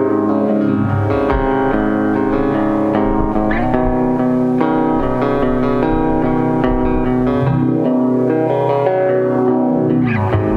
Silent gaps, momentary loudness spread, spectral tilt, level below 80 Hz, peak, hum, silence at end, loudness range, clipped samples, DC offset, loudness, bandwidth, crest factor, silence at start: none; 1 LU; -10 dB/octave; -28 dBFS; 0 dBFS; none; 0 s; 1 LU; under 0.1%; under 0.1%; -15 LUFS; 5.2 kHz; 14 dB; 0 s